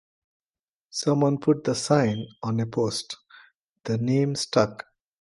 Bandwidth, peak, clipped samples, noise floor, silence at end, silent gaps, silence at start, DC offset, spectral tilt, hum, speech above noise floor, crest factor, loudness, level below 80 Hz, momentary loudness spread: 11.5 kHz; -4 dBFS; under 0.1%; under -90 dBFS; 0.4 s; 3.55-3.76 s; 0.95 s; under 0.1%; -5.5 dB/octave; none; over 66 dB; 22 dB; -25 LUFS; -64 dBFS; 16 LU